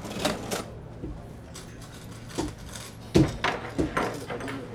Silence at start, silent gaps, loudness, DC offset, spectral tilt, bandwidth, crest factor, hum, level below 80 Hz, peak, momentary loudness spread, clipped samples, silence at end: 0 s; none; -30 LUFS; under 0.1%; -5 dB/octave; 18.5 kHz; 26 dB; none; -44 dBFS; -6 dBFS; 18 LU; under 0.1%; 0 s